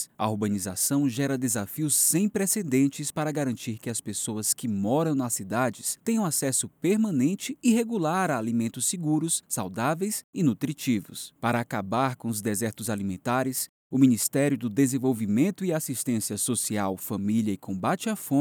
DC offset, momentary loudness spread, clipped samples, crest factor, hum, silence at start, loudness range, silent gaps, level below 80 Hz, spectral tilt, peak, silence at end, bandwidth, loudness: under 0.1%; 6 LU; under 0.1%; 18 dB; none; 0 s; 3 LU; 10.24-10.33 s, 13.69-13.90 s; -74 dBFS; -4.5 dB/octave; -8 dBFS; 0 s; over 20 kHz; -26 LUFS